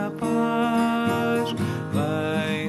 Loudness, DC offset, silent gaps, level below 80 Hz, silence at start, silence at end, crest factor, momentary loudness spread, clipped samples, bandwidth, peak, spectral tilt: -24 LUFS; under 0.1%; none; -52 dBFS; 0 s; 0 s; 12 dB; 4 LU; under 0.1%; 13.5 kHz; -12 dBFS; -6.5 dB/octave